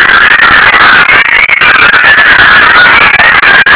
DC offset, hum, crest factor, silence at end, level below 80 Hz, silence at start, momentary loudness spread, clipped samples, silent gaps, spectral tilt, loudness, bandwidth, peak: under 0.1%; none; 2 dB; 0 s; -30 dBFS; 0 s; 2 LU; 40%; none; -5.5 dB/octave; -1 LUFS; 4 kHz; 0 dBFS